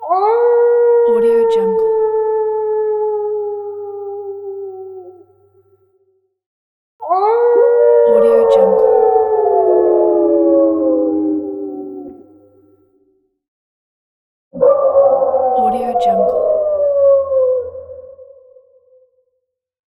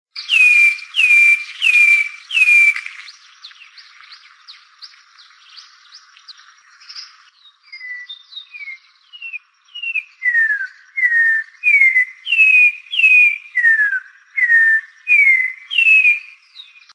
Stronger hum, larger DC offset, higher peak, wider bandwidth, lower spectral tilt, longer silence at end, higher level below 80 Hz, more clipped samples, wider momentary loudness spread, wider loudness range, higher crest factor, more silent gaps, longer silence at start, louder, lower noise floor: neither; neither; about the same, 0 dBFS vs -2 dBFS; second, 4.4 kHz vs 11 kHz; first, -7.5 dB/octave vs 12 dB/octave; first, 1.75 s vs 0.35 s; first, -56 dBFS vs under -90 dBFS; neither; second, 16 LU vs 23 LU; second, 14 LU vs 22 LU; about the same, 14 dB vs 14 dB; first, 6.46-6.99 s, 13.48-14.51 s vs none; second, 0 s vs 0.15 s; about the same, -13 LUFS vs -11 LUFS; first, -72 dBFS vs -50 dBFS